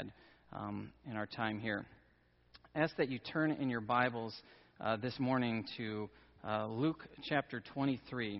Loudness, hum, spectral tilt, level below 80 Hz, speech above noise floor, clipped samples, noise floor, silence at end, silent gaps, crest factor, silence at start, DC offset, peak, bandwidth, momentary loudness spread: -38 LUFS; none; -4.5 dB/octave; -70 dBFS; 32 dB; under 0.1%; -70 dBFS; 0 s; none; 22 dB; 0 s; under 0.1%; -16 dBFS; 5.8 kHz; 12 LU